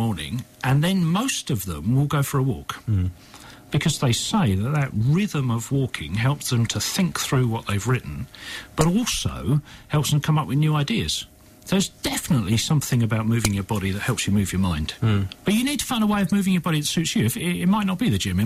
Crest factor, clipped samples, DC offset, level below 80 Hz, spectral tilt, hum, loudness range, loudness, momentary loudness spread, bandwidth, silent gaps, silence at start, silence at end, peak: 16 dB; under 0.1%; under 0.1%; -44 dBFS; -5 dB/octave; none; 2 LU; -23 LUFS; 5 LU; 16 kHz; none; 0 s; 0 s; -6 dBFS